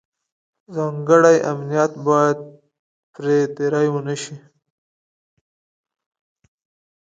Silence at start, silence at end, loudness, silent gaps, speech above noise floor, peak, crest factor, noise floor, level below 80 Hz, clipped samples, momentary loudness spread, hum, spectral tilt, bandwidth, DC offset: 0.7 s; 2.65 s; -18 LUFS; 2.79-3.14 s; over 72 dB; 0 dBFS; 20 dB; under -90 dBFS; -70 dBFS; under 0.1%; 15 LU; none; -6 dB/octave; 9.2 kHz; under 0.1%